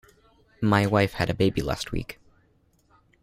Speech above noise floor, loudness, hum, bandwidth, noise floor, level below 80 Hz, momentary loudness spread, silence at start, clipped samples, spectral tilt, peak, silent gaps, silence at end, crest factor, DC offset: 40 dB; -25 LUFS; none; 15 kHz; -64 dBFS; -44 dBFS; 12 LU; 0.6 s; under 0.1%; -6 dB/octave; -6 dBFS; none; 1.1 s; 20 dB; under 0.1%